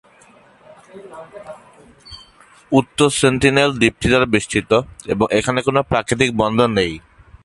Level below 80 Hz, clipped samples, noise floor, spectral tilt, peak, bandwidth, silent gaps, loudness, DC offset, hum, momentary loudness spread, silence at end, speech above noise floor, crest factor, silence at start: -42 dBFS; under 0.1%; -49 dBFS; -4.5 dB/octave; 0 dBFS; 11.5 kHz; none; -16 LUFS; under 0.1%; none; 23 LU; 0.45 s; 32 dB; 18 dB; 0.95 s